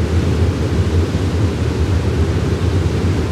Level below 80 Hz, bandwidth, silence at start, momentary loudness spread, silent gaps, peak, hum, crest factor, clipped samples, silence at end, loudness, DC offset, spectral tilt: -26 dBFS; 11.5 kHz; 0 s; 1 LU; none; -4 dBFS; none; 10 dB; under 0.1%; 0 s; -17 LUFS; under 0.1%; -7 dB/octave